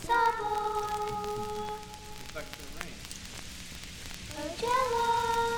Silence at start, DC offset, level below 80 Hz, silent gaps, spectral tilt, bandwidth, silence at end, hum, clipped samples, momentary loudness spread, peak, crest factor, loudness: 0 s; under 0.1%; -50 dBFS; none; -3 dB/octave; over 20 kHz; 0 s; none; under 0.1%; 15 LU; -14 dBFS; 20 dB; -33 LUFS